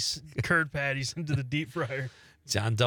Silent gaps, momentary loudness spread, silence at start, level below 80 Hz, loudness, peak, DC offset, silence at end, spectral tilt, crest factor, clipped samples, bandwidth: none; 7 LU; 0 s; -58 dBFS; -30 LUFS; -10 dBFS; under 0.1%; 0 s; -4 dB/octave; 20 dB; under 0.1%; 19.5 kHz